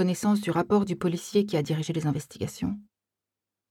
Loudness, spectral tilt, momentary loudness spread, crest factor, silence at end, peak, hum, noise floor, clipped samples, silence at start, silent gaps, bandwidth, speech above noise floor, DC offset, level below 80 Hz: -27 LUFS; -6.5 dB/octave; 9 LU; 16 dB; 0.9 s; -10 dBFS; none; -89 dBFS; under 0.1%; 0 s; none; 16 kHz; 62 dB; under 0.1%; -60 dBFS